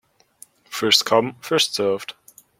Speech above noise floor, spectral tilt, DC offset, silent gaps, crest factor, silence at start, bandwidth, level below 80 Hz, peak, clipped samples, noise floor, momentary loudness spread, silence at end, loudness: 31 dB; -2.5 dB/octave; under 0.1%; none; 22 dB; 0.7 s; 16.5 kHz; -68 dBFS; 0 dBFS; under 0.1%; -51 dBFS; 15 LU; 0.5 s; -19 LUFS